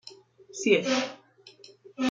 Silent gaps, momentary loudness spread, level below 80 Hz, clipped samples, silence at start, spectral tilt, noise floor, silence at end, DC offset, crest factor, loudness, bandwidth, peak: none; 24 LU; -78 dBFS; under 0.1%; 0.05 s; -3.5 dB/octave; -54 dBFS; 0 s; under 0.1%; 22 dB; -27 LUFS; 9.2 kHz; -8 dBFS